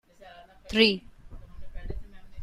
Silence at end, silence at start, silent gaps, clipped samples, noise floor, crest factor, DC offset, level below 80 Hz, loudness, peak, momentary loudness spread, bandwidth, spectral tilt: 0 s; 0.2 s; none; under 0.1%; -51 dBFS; 24 dB; under 0.1%; -44 dBFS; -24 LUFS; -6 dBFS; 24 LU; 12.5 kHz; -5 dB/octave